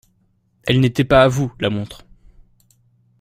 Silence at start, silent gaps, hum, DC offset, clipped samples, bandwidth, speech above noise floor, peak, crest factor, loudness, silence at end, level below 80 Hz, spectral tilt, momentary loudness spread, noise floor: 0.65 s; none; none; under 0.1%; under 0.1%; 15.5 kHz; 46 dB; -2 dBFS; 18 dB; -17 LUFS; 1.25 s; -40 dBFS; -6.5 dB/octave; 14 LU; -62 dBFS